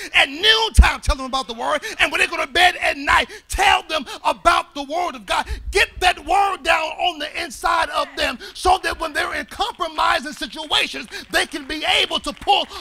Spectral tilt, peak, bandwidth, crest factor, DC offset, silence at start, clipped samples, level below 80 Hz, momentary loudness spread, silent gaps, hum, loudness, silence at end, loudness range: -3 dB/octave; 0 dBFS; 16 kHz; 20 dB; under 0.1%; 0 s; under 0.1%; -28 dBFS; 9 LU; none; none; -19 LUFS; 0 s; 4 LU